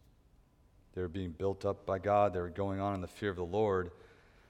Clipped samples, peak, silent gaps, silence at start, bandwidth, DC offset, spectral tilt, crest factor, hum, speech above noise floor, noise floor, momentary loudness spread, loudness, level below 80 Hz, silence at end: under 0.1%; -16 dBFS; none; 0.95 s; 12 kHz; under 0.1%; -7.5 dB/octave; 20 dB; none; 31 dB; -65 dBFS; 10 LU; -35 LUFS; -60 dBFS; 0.55 s